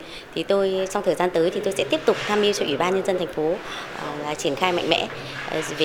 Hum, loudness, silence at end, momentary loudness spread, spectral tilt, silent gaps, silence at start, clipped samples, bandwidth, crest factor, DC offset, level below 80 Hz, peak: none; -23 LUFS; 0 s; 9 LU; -4 dB/octave; none; 0 s; under 0.1%; 18 kHz; 22 dB; under 0.1%; -54 dBFS; -2 dBFS